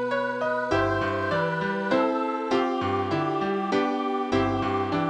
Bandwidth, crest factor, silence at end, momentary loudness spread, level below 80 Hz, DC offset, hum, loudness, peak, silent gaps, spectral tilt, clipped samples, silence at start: 9.6 kHz; 16 dB; 0 s; 3 LU; -52 dBFS; under 0.1%; none; -25 LUFS; -10 dBFS; none; -6.5 dB/octave; under 0.1%; 0 s